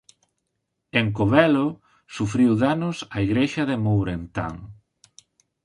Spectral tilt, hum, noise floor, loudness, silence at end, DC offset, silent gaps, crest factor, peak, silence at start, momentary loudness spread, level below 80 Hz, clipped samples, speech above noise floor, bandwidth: -7 dB/octave; none; -78 dBFS; -22 LUFS; 0.9 s; under 0.1%; none; 20 dB; -2 dBFS; 0.95 s; 12 LU; -48 dBFS; under 0.1%; 56 dB; 11 kHz